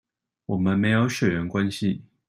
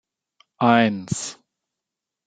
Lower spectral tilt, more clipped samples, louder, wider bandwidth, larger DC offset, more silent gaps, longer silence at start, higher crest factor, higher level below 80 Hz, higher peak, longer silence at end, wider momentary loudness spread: first, -6.5 dB/octave vs -5 dB/octave; neither; second, -24 LUFS vs -20 LUFS; first, 15.5 kHz vs 9.4 kHz; neither; neither; about the same, 0.5 s vs 0.6 s; second, 16 dB vs 22 dB; first, -56 dBFS vs -62 dBFS; second, -8 dBFS vs -2 dBFS; second, 0.25 s vs 0.95 s; second, 8 LU vs 12 LU